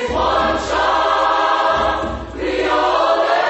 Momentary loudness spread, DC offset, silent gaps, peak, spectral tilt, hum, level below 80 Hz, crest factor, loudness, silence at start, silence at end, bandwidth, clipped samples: 7 LU; under 0.1%; none; -4 dBFS; -4 dB/octave; none; -36 dBFS; 14 dB; -16 LUFS; 0 s; 0 s; 8.4 kHz; under 0.1%